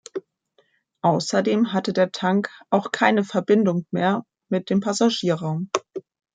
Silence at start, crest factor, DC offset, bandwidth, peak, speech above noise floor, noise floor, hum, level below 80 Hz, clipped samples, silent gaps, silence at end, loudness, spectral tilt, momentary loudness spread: 0.15 s; 20 dB; under 0.1%; 9.4 kHz; -2 dBFS; 44 dB; -65 dBFS; none; -70 dBFS; under 0.1%; none; 0.35 s; -22 LUFS; -5.5 dB/octave; 9 LU